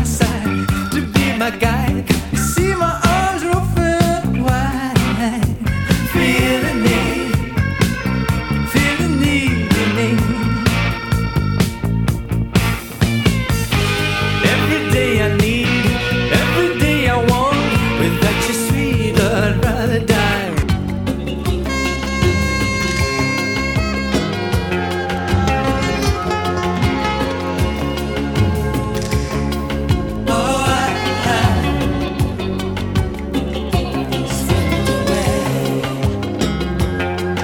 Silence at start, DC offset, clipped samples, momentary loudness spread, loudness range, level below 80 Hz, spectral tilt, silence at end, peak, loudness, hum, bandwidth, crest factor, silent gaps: 0 s; under 0.1%; under 0.1%; 5 LU; 3 LU; -26 dBFS; -5.5 dB/octave; 0 s; 0 dBFS; -17 LUFS; none; 19 kHz; 16 dB; none